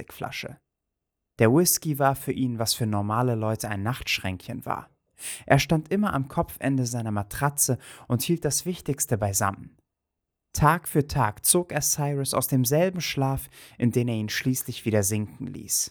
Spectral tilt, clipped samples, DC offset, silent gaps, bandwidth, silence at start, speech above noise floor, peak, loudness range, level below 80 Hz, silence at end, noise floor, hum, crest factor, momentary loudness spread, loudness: -4.5 dB/octave; under 0.1%; under 0.1%; none; over 20 kHz; 0 s; 58 dB; -4 dBFS; 3 LU; -50 dBFS; 0 s; -84 dBFS; none; 22 dB; 12 LU; -25 LUFS